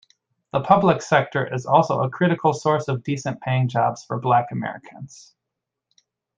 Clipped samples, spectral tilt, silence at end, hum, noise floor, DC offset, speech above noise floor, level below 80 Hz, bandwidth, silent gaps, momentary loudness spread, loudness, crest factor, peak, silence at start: under 0.1%; -6.5 dB/octave; 1.3 s; none; -83 dBFS; under 0.1%; 62 dB; -62 dBFS; 9.2 kHz; none; 13 LU; -21 LUFS; 20 dB; -2 dBFS; 0.55 s